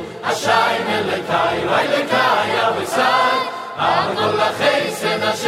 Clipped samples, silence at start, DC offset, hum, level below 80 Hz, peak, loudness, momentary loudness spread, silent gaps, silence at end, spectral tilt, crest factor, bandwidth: under 0.1%; 0 s; under 0.1%; none; -56 dBFS; -2 dBFS; -17 LUFS; 5 LU; none; 0 s; -3.5 dB/octave; 16 dB; 16 kHz